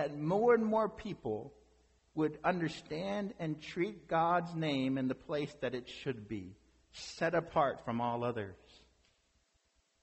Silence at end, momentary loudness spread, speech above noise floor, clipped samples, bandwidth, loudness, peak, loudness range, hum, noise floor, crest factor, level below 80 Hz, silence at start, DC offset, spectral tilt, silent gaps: 1.45 s; 14 LU; 41 dB; under 0.1%; 8.2 kHz; -35 LUFS; -18 dBFS; 3 LU; none; -76 dBFS; 18 dB; -66 dBFS; 0 s; under 0.1%; -6.5 dB/octave; none